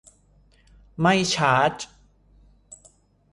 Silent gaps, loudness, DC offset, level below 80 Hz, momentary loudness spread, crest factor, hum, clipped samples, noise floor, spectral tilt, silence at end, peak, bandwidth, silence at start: none; -21 LUFS; under 0.1%; -56 dBFS; 19 LU; 22 dB; 50 Hz at -55 dBFS; under 0.1%; -58 dBFS; -4 dB/octave; 0.55 s; -4 dBFS; 11.5 kHz; 1 s